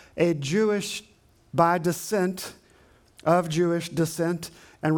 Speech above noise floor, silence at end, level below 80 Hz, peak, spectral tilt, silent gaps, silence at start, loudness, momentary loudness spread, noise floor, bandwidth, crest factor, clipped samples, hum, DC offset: 33 dB; 0 s; -64 dBFS; -6 dBFS; -5.5 dB/octave; none; 0.15 s; -25 LUFS; 12 LU; -57 dBFS; 19.5 kHz; 20 dB; under 0.1%; none; under 0.1%